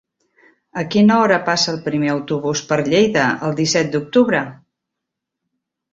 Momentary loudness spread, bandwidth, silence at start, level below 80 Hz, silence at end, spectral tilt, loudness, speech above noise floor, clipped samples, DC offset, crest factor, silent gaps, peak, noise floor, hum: 7 LU; 7.8 kHz; 0.75 s; -56 dBFS; 1.4 s; -4.5 dB/octave; -17 LUFS; 64 dB; under 0.1%; under 0.1%; 16 dB; none; -2 dBFS; -81 dBFS; none